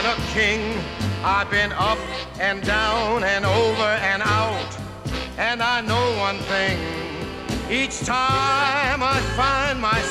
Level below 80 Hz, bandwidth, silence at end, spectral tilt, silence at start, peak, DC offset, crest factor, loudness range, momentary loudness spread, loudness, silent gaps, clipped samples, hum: -38 dBFS; 14.5 kHz; 0 s; -4 dB/octave; 0 s; -6 dBFS; 0.1%; 16 dB; 2 LU; 9 LU; -21 LUFS; none; under 0.1%; none